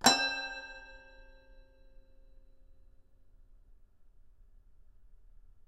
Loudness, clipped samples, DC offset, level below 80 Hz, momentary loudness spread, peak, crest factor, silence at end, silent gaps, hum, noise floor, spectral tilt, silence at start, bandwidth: -32 LUFS; under 0.1%; under 0.1%; -58 dBFS; 30 LU; -8 dBFS; 32 dB; 0.55 s; none; none; -59 dBFS; -0.5 dB/octave; 0 s; 15 kHz